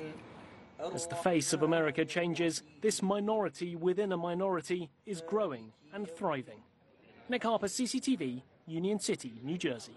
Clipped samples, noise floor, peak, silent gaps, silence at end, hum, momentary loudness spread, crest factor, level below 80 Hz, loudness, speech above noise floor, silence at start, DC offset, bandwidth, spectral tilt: under 0.1%; -63 dBFS; -14 dBFS; none; 0 s; none; 13 LU; 20 dB; -74 dBFS; -34 LUFS; 29 dB; 0 s; under 0.1%; 12 kHz; -4.5 dB/octave